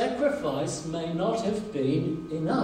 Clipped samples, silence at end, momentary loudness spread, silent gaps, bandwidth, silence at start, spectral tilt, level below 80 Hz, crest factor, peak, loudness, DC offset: under 0.1%; 0 s; 4 LU; none; 13 kHz; 0 s; -6 dB/octave; -56 dBFS; 14 dB; -14 dBFS; -29 LUFS; under 0.1%